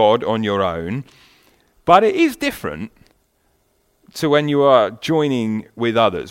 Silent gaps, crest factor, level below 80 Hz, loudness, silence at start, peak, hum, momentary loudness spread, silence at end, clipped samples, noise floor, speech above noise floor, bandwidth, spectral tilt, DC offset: none; 18 dB; -52 dBFS; -17 LUFS; 0 s; 0 dBFS; none; 15 LU; 0 s; under 0.1%; -63 dBFS; 46 dB; 16.5 kHz; -6 dB/octave; under 0.1%